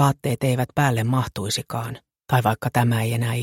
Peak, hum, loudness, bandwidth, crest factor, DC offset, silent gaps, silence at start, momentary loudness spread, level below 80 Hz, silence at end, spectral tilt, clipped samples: -2 dBFS; none; -22 LUFS; 16.5 kHz; 18 dB; under 0.1%; none; 0 s; 9 LU; -52 dBFS; 0 s; -5.5 dB/octave; under 0.1%